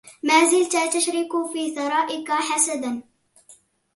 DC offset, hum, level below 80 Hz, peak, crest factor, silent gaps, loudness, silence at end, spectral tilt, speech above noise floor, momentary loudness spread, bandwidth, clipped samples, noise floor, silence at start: under 0.1%; none; -74 dBFS; -2 dBFS; 20 dB; none; -21 LUFS; 0.4 s; -0.5 dB/octave; 33 dB; 10 LU; 12 kHz; under 0.1%; -54 dBFS; 0.05 s